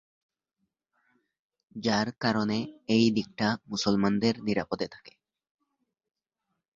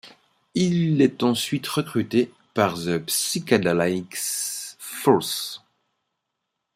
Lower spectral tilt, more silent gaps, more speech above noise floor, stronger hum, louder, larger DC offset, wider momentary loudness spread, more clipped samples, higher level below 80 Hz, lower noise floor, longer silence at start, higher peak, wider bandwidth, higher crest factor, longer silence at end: about the same, -5.5 dB/octave vs -4.5 dB/octave; neither; about the same, 56 dB vs 58 dB; neither; second, -28 LUFS vs -23 LUFS; neither; about the same, 9 LU vs 9 LU; neither; about the same, -62 dBFS vs -64 dBFS; about the same, -83 dBFS vs -80 dBFS; first, 1.75 s vs 0.05 s; second, -10 dBFS vs -4 dBFS; second, 7.6 kHz vs 16 kHz; about the same, 20 dB vs 20 dB; first, 1.65 s vs 1.2 s